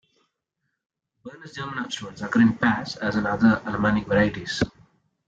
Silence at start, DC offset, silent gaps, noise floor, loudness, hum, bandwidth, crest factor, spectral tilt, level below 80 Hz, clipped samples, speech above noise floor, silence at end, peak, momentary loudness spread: 1.25 s; under 0.1%; none; -79 dBFS; -23 LUFS; none; 7.8 kHz; 18 dB; -6 dB/octave; -50 dBFS; under 0.1%; 56 dB; 0.6 s; -8 dBFS; 12 LU